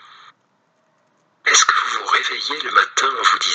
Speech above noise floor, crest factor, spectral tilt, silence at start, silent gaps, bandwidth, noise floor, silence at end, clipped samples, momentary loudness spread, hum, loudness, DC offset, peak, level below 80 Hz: 45 dB; 20 dB; 3 dB/octave; 1.45 s; none; 9.4 kHz; -63 dBFS; 0 s; under 0.1%; 9 LU; none; -16 LUFS; under 0.1%; 0 dBFS; -74 dBFS